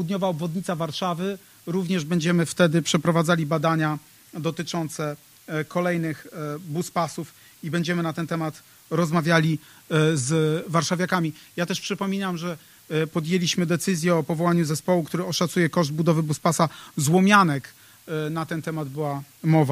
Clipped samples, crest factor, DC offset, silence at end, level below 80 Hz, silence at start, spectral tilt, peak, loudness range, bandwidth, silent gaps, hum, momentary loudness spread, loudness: under 0.1%; 22 dB; under 0.1%; 0 s; -64 dBFS; 0 s; -5.5 dB/octave; -2 dBFS; 6 LU; 15.5 kHz; none; none; 10 LU; -24 LUFS